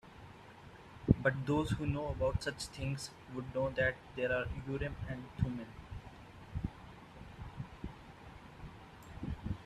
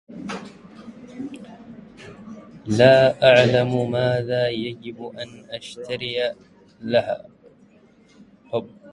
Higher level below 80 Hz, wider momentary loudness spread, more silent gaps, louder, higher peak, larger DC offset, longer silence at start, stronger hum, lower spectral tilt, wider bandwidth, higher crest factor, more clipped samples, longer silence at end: first, -50 dBFS vs -58 dBFS; second, 21 LU vs 27 LU; neither; second, -38 LUFS vs -20 LUFS; second, -10 dBFS vs -2 dBFS; neither; about the same, 0.05 s vs 0.1 s; neither; about the same, -6.5 dB/octave vs -6 dB/octave; first, 13.5 kHz vs 11 kHz; first, 30 dB vs 20 dB; neither; about the same, 0 s vs 0 s